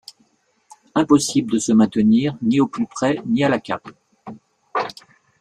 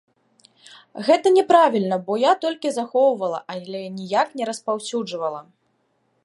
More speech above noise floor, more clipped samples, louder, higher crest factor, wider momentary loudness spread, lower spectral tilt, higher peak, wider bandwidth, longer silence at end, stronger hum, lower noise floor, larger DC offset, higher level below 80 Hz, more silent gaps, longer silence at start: about the same, 44 dB vs 47 dB; neither; about the same, -19 LUFS vs -21 LUFS; about the same, 18 dB vs 20 dB; about the same, 13 LU vs 15 LU; about the same, -5 dB/octave vs -4.5 dB/octave; about the same, -2 dBFS vs -2 dBFS; about the same, 12.5 kHz vs 11.5 kHz; second, 0.5 s vs 0.8 s; neither; second, -62 dBFS vs -68 dBFS; neither; first, -58 dBFS vs -78 dBFS; neither; about the same, 0.95 s vs 0.95 s